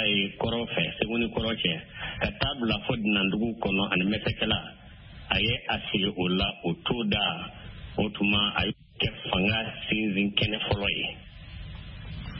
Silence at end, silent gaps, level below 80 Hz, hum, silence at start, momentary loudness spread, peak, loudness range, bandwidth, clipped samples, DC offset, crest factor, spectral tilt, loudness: 0 s; none; -46 dBFS; none; 0 s; 15 LU; -8 dBFS; 1 LU; 5.8 kHz; under 0.1%; under 0.1%; 20 dB; -9.5 dB/octave; -27 LUFS